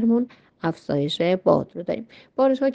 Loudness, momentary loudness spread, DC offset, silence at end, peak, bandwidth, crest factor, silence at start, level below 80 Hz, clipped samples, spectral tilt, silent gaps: -24 LUFS; 11 LU; under 0.1%; 0 s; -4 dBFS; 8.8 kHz; 18 dB; 0 s; -62 dBFS; under 0.1%; -7.5 dB/octave; none